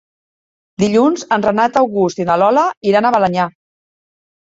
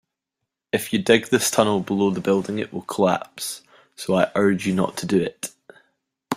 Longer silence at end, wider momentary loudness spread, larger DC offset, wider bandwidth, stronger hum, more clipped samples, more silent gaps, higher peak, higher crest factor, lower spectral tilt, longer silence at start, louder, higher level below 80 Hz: first, 1 s vs 0 s; second, 4 LU vs 12 LU; neither; second, 8 kHz vs 16 kHz; neither; neither; first, 2.77-2.81 s vs none; about the same, 0 dBFS vs -2 dBFS; about the same, 16 dB vs 20 dB; first, -6 dB/octave vs -4.5 dB/octave; about the same, 0.8 s vs 0.75 s; first, -14 LUFS vs -22 LUFS; first, -54 dBFS vs -60 dBFS